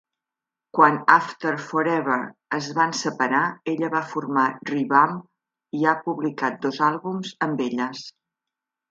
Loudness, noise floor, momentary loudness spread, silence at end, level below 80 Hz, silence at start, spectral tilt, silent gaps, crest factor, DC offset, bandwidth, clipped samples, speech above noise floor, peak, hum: -22 LUFS; -88 dBFS; 11 LU; 0.8 s; -76 dBFS; 0.75 s; -5 dB/octave; none; 24 dB; under 0.1%; 7.8 kHz; under 0.1%; 65 dB; 0 dBFS; none